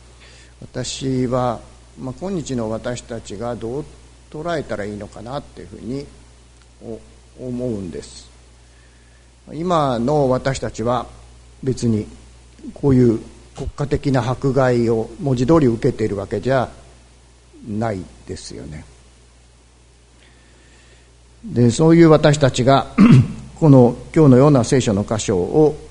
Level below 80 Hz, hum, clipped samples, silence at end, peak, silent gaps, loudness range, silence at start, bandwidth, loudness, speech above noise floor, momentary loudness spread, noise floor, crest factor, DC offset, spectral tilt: -42 dBFS; none; under 0.1%; 0 s; 0 dBFS; none; 18 LU; 0.6 s; 11 kHz; -17 LUFS; 32 dB; 23 LU; -49 dBFS; 18 dB; under 0.1%; -7 dB/octave